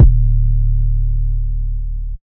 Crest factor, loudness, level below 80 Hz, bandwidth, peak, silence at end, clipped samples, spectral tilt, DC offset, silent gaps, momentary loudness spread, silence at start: 14 dB; -19 LUFS; -14 dBFS; 0.8 kHz; 0 dBFS; 0.1 s; 0.5%; -13.5 dB/octave; under 0.1%; none; 10 LU; 0 s